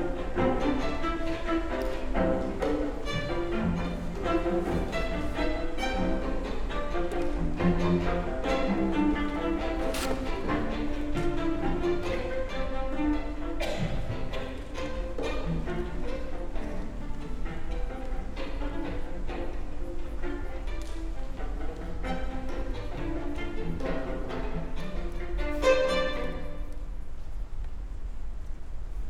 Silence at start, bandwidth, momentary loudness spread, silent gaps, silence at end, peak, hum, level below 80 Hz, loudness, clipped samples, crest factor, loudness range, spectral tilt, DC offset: 0 s; 11.5 kHz; 12 LU; none; 0 s; -12 dBFS; none; -34 dBFS; -32 LUFS; under 0.1%; 18 dB; 8 LU; -6.5 dB/octave; under 0.1%